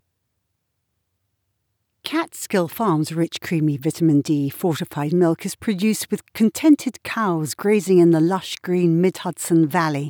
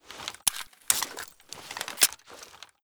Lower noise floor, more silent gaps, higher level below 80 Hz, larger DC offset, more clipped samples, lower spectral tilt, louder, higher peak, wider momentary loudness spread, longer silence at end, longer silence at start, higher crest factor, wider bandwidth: first, -75 dBFS vs -49 dBFS; neither; about the same, -66 dBFS vs -68 dBFS; neither; neither; first, -6 dB/octave vs 1.5 dB/octave; first, -20 LUFS vs -27 LUFS; about the same, -4 dBFS vs -6 dBFS; second, 9 LU vs 22 LU; second, 0 s vs 0.2 s; first, 2.05 s vs 0.05 s; second, 16 dB vs 26 dB; about the same, 20 kHz vs over 20 kHz